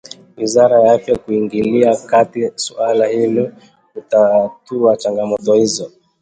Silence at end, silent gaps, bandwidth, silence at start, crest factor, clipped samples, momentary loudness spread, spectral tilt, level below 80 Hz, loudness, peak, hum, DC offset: 0.35 s; none; 9.4 kHz; 0.4 s; 14 dB; under 0.1%; 11 LU; -5 dB/octave; -54 dBFS; -15 LUFS; 0 dBFS; none; under 0.1%